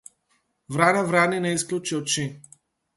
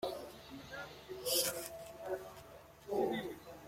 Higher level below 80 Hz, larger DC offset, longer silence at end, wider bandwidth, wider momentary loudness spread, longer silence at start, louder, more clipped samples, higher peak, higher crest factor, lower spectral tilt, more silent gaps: about the same, -66 dBFS vs -68 dBFS; neither; first, 0.55 s vs 0 s; second, 12 kHz vs 16.5 kHz; second, 8 LU vs 19 LU; first, 0.7 s vs 0 s; first, -23 LUFS vs -40 LUFS; neither; first, -4 dBFS vs -20 dBFS; about the same, 22 dB vs 22 dB; first, -4 dB/octave vs -2.5 dB/octave; neither